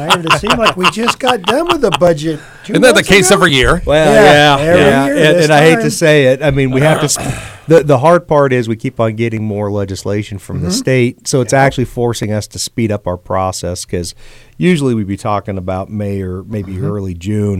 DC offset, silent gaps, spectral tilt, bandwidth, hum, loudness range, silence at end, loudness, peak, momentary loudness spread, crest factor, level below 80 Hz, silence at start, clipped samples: under 0.1%; none; -4.5 dB/octave; 17 kHz; none; 9 LU; 0 s; -11 LUFS; 0 dBFS; 13 LU; 12 dB; -34 dBFS; 0 s; 0.4%